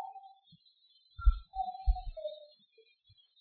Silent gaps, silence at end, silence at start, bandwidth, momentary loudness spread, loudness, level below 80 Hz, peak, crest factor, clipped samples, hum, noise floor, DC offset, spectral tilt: none; 0.95 s; 0 s; 4.5 kHz; 24 LU; -37 LUFS; -36 dBFS; -14 dBFS; 22 dB; under 0.1%; none; -68 dBFS; under 0.1%; -5.5 dB/octave